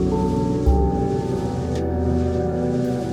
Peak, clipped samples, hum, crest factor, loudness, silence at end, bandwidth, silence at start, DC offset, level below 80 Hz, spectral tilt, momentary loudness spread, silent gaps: -6 dBFS; under 0.1%; none; 16 dB; -22 LUFS; 0 s; 11 kHz; 0 s; under 0.1%; -28 dBFS; -8.5 dB/octave; 5 LU; none